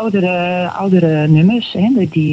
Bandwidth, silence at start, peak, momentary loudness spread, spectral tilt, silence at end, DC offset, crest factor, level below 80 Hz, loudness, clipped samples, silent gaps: 7.4 kHz; 0 s; 0 dBFS; 5 LU; -9 dB/octave; 0 s; under 0.1%; 12 dB; -56 dBFS; -13 LUFS; under 0.1%; none